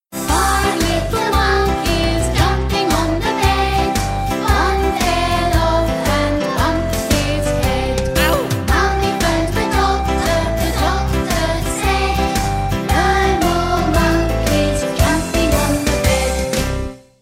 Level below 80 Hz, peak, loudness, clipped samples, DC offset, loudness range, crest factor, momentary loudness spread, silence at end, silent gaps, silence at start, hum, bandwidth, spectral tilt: -22 dBFS; -2 dBFS; -17 LUFS; under 0.1%; under 0.1%; 1 LU; 14 dB; 3 LU; 0.25 s; none; 0.1 s; none; 16.5 kHz; -4.5 dB/octave